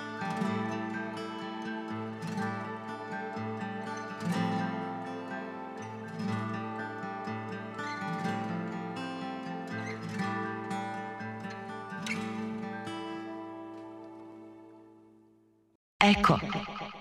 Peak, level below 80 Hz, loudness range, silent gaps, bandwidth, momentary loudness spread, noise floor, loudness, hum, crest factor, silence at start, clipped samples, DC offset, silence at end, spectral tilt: -8 dBFS; -60 dBFS; 8 LU; 15.75-16.00 s; 13.5 kHz; 10 LU; -65 dBFS; -34 LUFS; none; 26 dB; 0 s; under 0.1%; under 0.1%; 0 s; -5.5 dB/octave